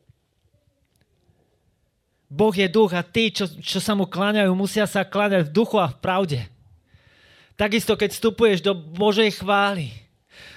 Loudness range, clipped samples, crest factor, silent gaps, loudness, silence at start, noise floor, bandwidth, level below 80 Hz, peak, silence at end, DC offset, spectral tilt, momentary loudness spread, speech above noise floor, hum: 3 LU; under 0.1%; 16 dB; none; -21 LUFS; 2.3 s; -69 dBFS; 15.5 kHz; -54 dBFS; -6 dBFS; 0.05 s; under 0.1%; -5 dB/octave; 7 LU; 48 dB; none